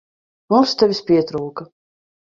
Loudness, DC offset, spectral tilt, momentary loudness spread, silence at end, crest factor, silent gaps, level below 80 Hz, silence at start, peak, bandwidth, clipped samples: -17 LUFS; under 0.1%; -6 dB/octave; 14 LU; 0.6 s; 18 dB; none; -58 dBFS; 0.5 s; -2 dBFS; 7.4 kHz; under 0.1%